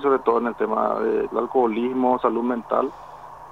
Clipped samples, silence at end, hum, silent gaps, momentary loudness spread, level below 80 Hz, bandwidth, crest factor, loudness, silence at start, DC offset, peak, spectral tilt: under 0.1%; 0 s; none; none; 9 LU; -60 dBFS; 7 kHz; 16 dB; -22 LUFS; 0 s; 0.1%; -6 dBFS; -7.5 dB/octave